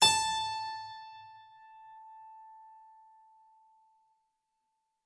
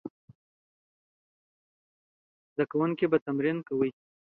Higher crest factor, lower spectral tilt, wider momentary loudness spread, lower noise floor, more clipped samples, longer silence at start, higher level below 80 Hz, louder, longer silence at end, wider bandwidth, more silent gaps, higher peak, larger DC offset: about the same, 26 dB vs 22 dB; second, 0.5 dB/octave vs -10.5 dB/octave; first, 25 LU vs 8 LU; second, -82 dBFS vs under -90 dBFS; neither; about the same, 0 s vs 0.05 s; about the same, -72 dBFS vs -74 dBFS; about the same, -31 LUFS vs -29 LUFS; first, 2.4 s vs 0.35 s; first, 11.5 kHz vs 4.4 kHz; second, none vs 0.10-0.28 s, 0.35-2.56 s, 3.21-3.26 s; about the same, -10 dBFS vs -10 dBFS; neither